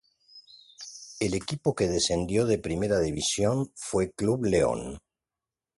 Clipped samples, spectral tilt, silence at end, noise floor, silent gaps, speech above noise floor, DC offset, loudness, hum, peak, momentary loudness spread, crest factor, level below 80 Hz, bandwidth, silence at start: under 0.1%; -4.5 dB/octave; 0.8 s; under -90 dBFS; none; over 63 dB; under 0.1%; -27 LUFS; none; -10 dBFS; 16 LU; 18 dB; -48 dBFS; 11.5 kHz; 0.35 s